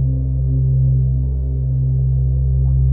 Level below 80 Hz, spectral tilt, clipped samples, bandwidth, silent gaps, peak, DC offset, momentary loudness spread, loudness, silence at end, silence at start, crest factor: -20 dBFS; -17.5 dB/octave; under 0.1%; 0.9 kHz; none; -8 dBFS; under 0.1%; 4 LU; -18 LUFS; 0 s; 0 s; 8 dB